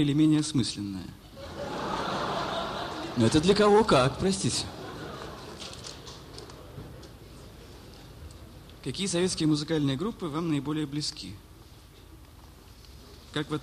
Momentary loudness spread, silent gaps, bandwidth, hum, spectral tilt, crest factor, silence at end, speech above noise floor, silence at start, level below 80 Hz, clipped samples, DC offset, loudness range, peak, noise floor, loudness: 25 LU; none; 15 kHz; none; -5 dB/octave; 20 dB; 0 s; 25 dB; 0 s; -50 dBFS; under 0.1%; under 0.1%; 17 LU; -10 dBFS; -51 dBFS; -28 LUFS